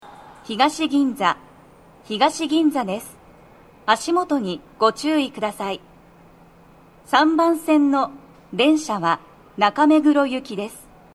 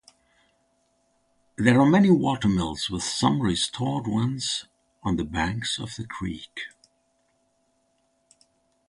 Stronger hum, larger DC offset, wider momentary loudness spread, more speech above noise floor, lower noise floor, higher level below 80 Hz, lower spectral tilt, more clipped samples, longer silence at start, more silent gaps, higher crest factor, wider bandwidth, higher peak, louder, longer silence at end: neither; neither; about the same, 14 LU vs 16 LU; second, 30 dB vs 46 dB; second, -49 dBFS vs -70 dBFS; second, -60 dBFS vs -48 dBFS; about the same, -4 dB/octave vs -5 dB/octave; neither; second, 0.05 s vs 1.6 s; neither; about the same, 20 dB vs 22 dB; first, 13 kHz vs 11.5 kHz; about the same, -2 dBFS vs -4 dBFS; first, -20 LUFS vs -24 LUFS; second, 0.35 s vs 2.2 s